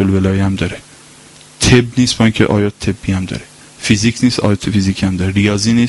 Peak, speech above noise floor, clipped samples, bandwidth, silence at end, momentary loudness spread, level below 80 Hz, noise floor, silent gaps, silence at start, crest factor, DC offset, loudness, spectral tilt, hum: 0 dBFS; 27 dB; under 0.1%; 11.5 kHz; 0 s; 10 LU; -36 dBFS; -40 dBFS; none; 0 s; 14 dB; under 0.1%; -14 LUFS; -5 dB/octave; none